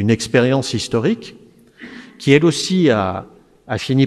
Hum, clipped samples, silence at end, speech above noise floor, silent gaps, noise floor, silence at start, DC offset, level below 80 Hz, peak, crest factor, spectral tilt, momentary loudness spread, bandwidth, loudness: none; under 0.1%; 0 s; 25 dB; none; -40 dBFS; 0 s; under 0.1%; -52 dBFS; 0 dBFS; 18 dB; -5.5 dB/octave; 22 LU; 13 kHz; -17 LUFS